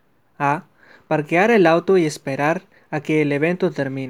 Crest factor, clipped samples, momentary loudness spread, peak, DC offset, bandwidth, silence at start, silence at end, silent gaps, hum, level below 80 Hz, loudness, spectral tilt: 20 dB; under 0.1%; 11 LU; 0 dBFS; 0.1%; 13.5 kHz; 0.4 s; 0 s; none; none; -72 dBFS; -19 LUFS; -6.5 dB/octave